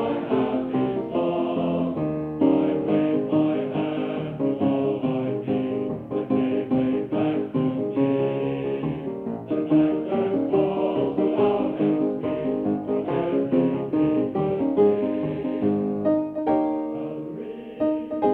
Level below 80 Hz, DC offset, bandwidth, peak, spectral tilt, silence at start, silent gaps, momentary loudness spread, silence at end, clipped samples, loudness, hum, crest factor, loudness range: -56 dBFS; under 0.1%; 4.2 kHz; -8 dBFS; -10.5 dB/octave; 0 s; none; 6 LU; 0 s; under 0.1%; -24 LUFS; none; 16 dB; 2 LU